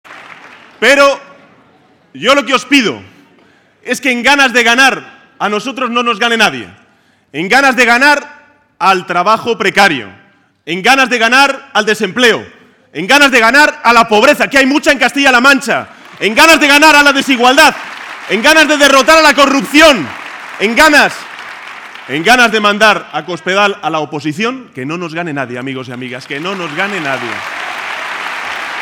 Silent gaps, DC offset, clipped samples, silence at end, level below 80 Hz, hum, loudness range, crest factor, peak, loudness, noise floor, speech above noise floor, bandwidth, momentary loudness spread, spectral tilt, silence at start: none; under 0.1%; 0.8%; 0 s; -46 dBFS; none; 9 LU; 12 dB; 0 dBFS; -9 LUFS; -50 dBFS; 41 dB; over 20 kHz; 16 LU; -2.5 dB/octave; 0.1 s